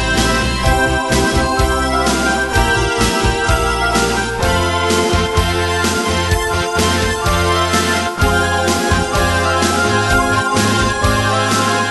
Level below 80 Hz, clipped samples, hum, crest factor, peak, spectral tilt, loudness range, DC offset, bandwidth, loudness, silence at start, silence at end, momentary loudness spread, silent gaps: -24 dBFS; under 0.1%; none; 14 dB; 0 dBFS; -4 dB/octave; 1 LU; under 0.1%; 12 kHz; -14 LUFS; 0 s; 0 s; 2 LU; none